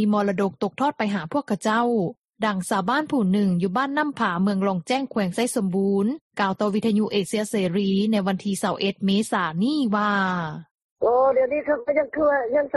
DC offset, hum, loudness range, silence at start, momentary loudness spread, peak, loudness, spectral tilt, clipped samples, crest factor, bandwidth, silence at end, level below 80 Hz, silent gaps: under 0.1%; none; 1 LU; 0 s; 5 LU; -8 dBFS; -23 LUFS; -6 dB/octave; under 0.1%; 16 dB; 12.5 kHz; 0 s; -62 dBFS; 2.18-2.22 s, 2.30-2.34 s, 6.21-6.31 s, 10.71-10.96 s